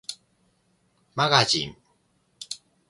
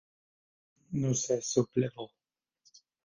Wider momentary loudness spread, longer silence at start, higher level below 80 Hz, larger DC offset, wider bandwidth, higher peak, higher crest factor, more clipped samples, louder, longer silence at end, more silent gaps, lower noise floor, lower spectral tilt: first, 22 LU vs 14 LU; second, 0.1 s vs 0.9 s; first, -62 dBFS vs -68 dBFS; neither; first, 12 kHz vs 10 kHz; first, -2 dBFS vs -12 dBFS; first, 28 dB vs 22 dB; neither; first, -22 LUFS vs -31 LUFS; second, 0.35 s vs 1 s; neither; second, -68 dBFS vs -72 dBFS; second, -3 dB/octave vs -5.5 dB/octave